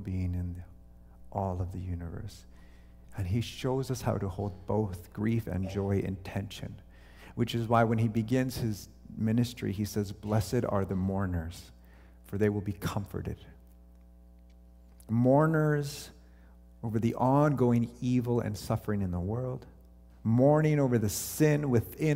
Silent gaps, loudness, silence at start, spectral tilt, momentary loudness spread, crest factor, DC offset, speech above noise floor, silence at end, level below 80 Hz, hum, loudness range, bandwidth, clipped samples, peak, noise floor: none; -30 LUFS; 0 s; -7 dB/octave; 16 LU; 20 dB; under 0.1%; 25 dB; 0 s; -52 dBFS; 60 Hz at -50 dBFS; 7 LU; 16 kHz; under 0.1%; -10 dBFS; -55 dBFS